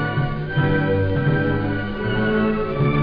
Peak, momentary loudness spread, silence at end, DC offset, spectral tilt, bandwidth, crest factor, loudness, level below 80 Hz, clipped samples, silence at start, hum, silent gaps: -8 dBFS; 4 LU; 0 s; 0.6%; -10 dB/octave; 5.2 kHz; 12 dB; -21 LUFS; -34 dBFS; under 0.1%; 0 s; none; none